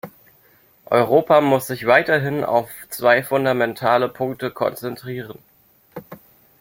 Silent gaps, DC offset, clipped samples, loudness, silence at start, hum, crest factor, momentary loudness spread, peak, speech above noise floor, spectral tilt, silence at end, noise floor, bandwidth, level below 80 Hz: none; under 0.1%; under 0.1%; -19 LUFS; 0.05 s; none; 18 dB; 22 LU; -2 dBFS; 36 dB; -5.5 dB/octave; 0.45 s; -55 dBFS; 17 kHz; -62 dBFS